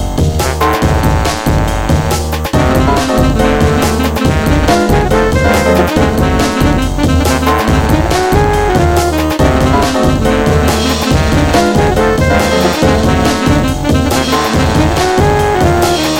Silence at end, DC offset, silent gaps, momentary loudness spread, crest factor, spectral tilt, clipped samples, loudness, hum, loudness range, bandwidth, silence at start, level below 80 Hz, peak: 0 s; 0.7%; none; 3 LU; 10 dB; -5.5 dB/octave; under 0.1%; -11 LUFS; none; 1 LU; 17 kHz; 0 s; -18 dBFS; 0 dBFS